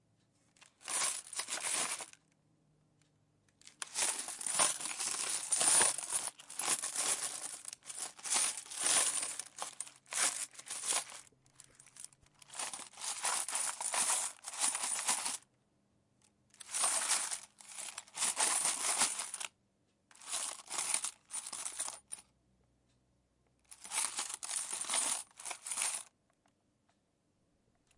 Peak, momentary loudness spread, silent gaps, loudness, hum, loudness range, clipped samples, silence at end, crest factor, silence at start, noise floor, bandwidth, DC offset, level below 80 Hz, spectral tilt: -14 dBFS; 15 LU; none; -34 LUFS; none; 8 LU; under 0.1%; 1.95 s; 24 dB; 0.6 s; -77 dBFS; 11.5 kHz; under 0.1%; -86 dBFS; 2 dB/octave